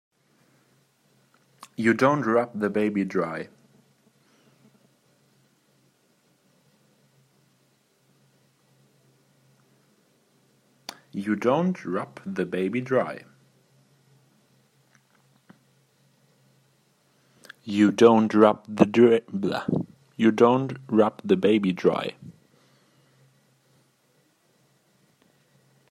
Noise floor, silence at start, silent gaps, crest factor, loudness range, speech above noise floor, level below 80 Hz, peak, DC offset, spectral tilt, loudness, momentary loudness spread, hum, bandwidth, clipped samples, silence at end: -66 dBFS; 1.8 s; none; 24 dB; 12 LU; 44 dB; -72 dBFS; -2 dBFS; under 0.1%; -7 dB/octave; -23 LUFS; 18 LU; none; 12.5 kHz; under 0.1%; 3.6 s